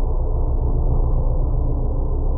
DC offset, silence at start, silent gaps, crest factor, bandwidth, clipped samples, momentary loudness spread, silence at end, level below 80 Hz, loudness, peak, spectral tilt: under 0.1%; 0 s; none; 10 dB; 1.4 kHz; under 0.1%; 2 LU; 0 s; -18 dBFS; -23 LUFS; -8 dBFS; -16 dB/octave